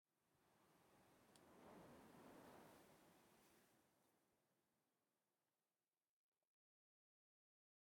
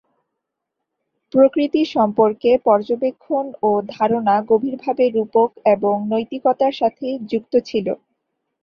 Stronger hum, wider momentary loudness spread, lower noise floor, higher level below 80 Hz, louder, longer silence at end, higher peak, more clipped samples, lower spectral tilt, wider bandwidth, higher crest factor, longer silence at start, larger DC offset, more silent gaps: neither; second, 3 LU vs 8 LU; first, under -90 dBFS vs -80 dBFS; second, under -90 dBFS vs -62 dBFS; second, -67 LUFS vs -18 LUFS; first, 2.45 s vs 0.7 s; second, -54 dBFS vs -2 dBFS; neither; second, -4.5 dB/octave vs -7.5 dB/octave; first, 17.5 kHz vs 6.8 kHz; about the same, 20 dB vs 18 dB; second, 0.1 s vs 1.35 s; neither; neither